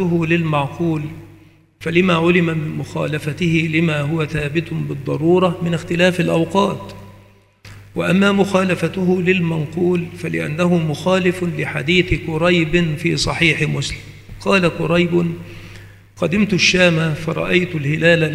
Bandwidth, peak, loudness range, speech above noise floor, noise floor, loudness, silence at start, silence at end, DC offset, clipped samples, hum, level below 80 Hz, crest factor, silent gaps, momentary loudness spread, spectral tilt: 13 kHz; 0 dBFS; 2 LU; 31 dB; -48 dBFS; -17 LUFS; 0 s; 0 s; under 0.1%; under 0.1%; none; -40 dBFS; 18 dB; none; 10 LU; -6 dB/octave